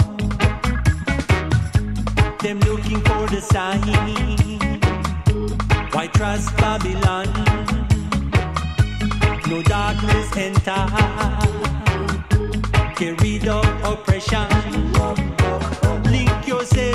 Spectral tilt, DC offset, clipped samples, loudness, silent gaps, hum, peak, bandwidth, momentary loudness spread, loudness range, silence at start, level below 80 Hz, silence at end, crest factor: -6 dB/octave; under 0.1%; under 0.1%; -20 LUFS; none; none; -4 dBFS; 13.5 kHz; 2 LU; 1 LU; 0 s; -26 dBFS; 0 s; 14 dB